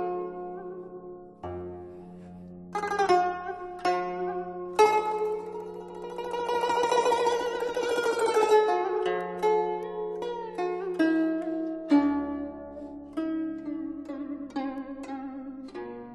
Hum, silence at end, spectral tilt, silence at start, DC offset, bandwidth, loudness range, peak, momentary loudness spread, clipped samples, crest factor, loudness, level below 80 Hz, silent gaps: none; 0 s; -4.5 dB/octave; 0 s; under 0.1%; 12 kHz; 7 LU; -8 dBFS; 17 LU; under 0.1%; 20 dB; -28 LUFS; -62 dBFS; none